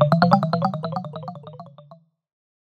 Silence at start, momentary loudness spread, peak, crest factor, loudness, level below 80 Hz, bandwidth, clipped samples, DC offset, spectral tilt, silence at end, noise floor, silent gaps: 0 s; 24 LU; 0 dBFS; 22 dB; -21 LUFS; -60 dBFS; 8.2 kHz; under 0.1%; under 0.1%; -8.5 dB/octave; 0.7 s; -51 dBFS; none